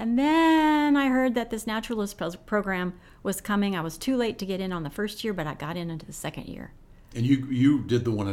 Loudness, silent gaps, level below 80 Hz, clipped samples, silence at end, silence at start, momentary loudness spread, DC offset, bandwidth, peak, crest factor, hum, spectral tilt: -26 LUFS; none; -50 dBFS; under 0.1%; 0 s; 0 s; 14 LU; under 0.1%; 16 kHz; -10 dBFS; 16 dB; none; -6 dB/octave